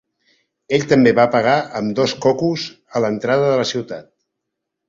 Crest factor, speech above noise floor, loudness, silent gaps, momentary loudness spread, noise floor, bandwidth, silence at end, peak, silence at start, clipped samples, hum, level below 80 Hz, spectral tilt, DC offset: 16 dB; 62 dB; -17 LUFS; none; 12 LU; -79 dBFS; 7.6 kHz; 0.85 s; -2 dBFS; 0.7 s; under 0.1%; none; -58 dBFS; -5.5 dB/octave; under 0.1%